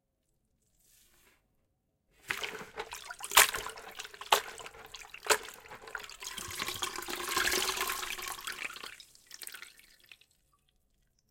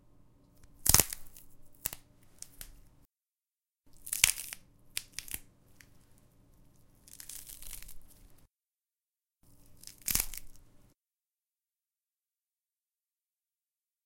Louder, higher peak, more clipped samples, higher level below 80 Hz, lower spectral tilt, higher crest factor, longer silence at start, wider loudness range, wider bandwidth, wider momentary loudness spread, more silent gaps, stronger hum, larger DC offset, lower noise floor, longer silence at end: about the same, -32 LUFS vs -31 LUFS; second, -4 dBFS vs 0 dBFS; neither; second, -64 dBFS vs -52 dBFS; about the same, 0.5 dB/octave vs -0.5 dB/octave; second, 34 dB vs 40 dB; first, 2.25 s vs 0.6 s; second, 11 LU vs 18 LU; about the same, 17 kHz vs 17 kHz; second, 20 LU vs 26 LU; neither; neither; neither; second, -78 dBFS vs under -90 dBFS; second, 1.15 s vs 3.45 s